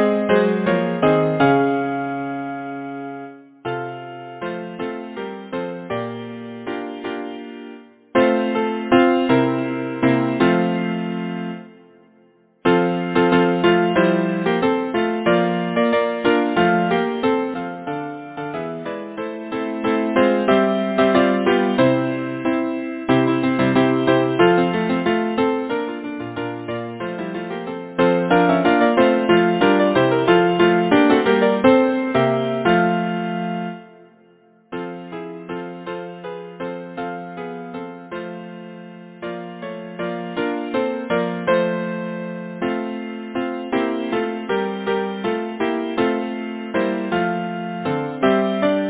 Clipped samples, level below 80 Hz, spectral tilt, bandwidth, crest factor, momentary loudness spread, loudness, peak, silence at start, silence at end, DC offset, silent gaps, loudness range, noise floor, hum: under 0.1%; -56 dBFS; -10.5 dB/octave; 4 kHz; 20 dB; 15 LU; -20 LUFS; 0 dBFS; 0 s; 0 s; under 0.1%; none; 13 LU; -55 dBFS; none